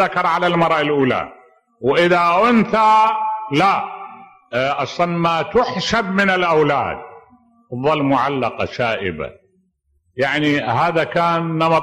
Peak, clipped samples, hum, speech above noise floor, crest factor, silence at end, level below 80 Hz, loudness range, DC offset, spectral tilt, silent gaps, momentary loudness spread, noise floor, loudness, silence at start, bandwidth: -4 dBFS; under 0.1%; none; 47 dB; 14 dB; 0 s; -52 dBFS; 5 LU; under 0.1%; -6 dB/octave; none; 12 LU; -64 dBFS; -17 LUFS; 0 s; 13.5 kHz